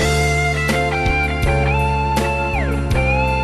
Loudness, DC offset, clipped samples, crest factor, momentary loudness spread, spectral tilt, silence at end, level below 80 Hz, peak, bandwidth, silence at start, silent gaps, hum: -18 LUFS; under 0.1%; under 0.1%; 10 dB; 3 LU; -5.5 dB/octave; 0 s; -22 dBFS; -6 dBFS; 13.5 kHz; 0 s; none; none